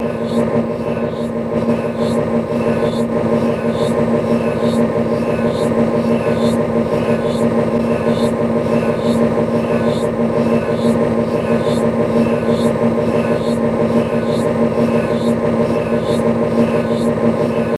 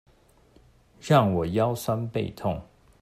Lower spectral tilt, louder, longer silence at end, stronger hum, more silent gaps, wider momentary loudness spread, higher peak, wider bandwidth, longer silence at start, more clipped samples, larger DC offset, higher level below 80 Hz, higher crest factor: about the same, -7.5 dB/octave vs -7 dB/octave; first, -16 LUFS vs -26 LUFS; second, 0 s vs 0.4 s; neither; neither; second, 2 LU vs 11 LU; first, 0 dBFS vs -6 dBFS; second, 12.5 kHz vs 15.5 kHz; second, 0 s vs 1.05 s; neither; neither; first, -42 dBFS vs -54 dBFS; second, 14 dB vs 22 dB